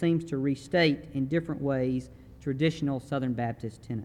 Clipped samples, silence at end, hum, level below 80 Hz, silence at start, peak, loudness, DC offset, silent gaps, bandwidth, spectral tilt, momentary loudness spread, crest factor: under 0.1%; 0 s; none; -56 dBFS; 0 s; -12 dBFS; -29 LUFS; under 0.1%; none; 11.5 kHz; -7 dB/octave; 11 LU; 16 dB